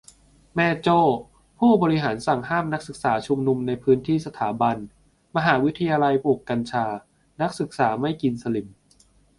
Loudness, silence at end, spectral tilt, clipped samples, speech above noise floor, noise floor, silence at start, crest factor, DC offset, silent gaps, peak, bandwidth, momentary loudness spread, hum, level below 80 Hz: -23 LUFS; 0.7 s; -7 dB/octave; under 0.1%; 36 dB; -58 dBFS; 0.55 s; 18 dB; under 0.1%; none; -4 dBFS; 11.5 kHz; 10 LU; none; -56 dBFS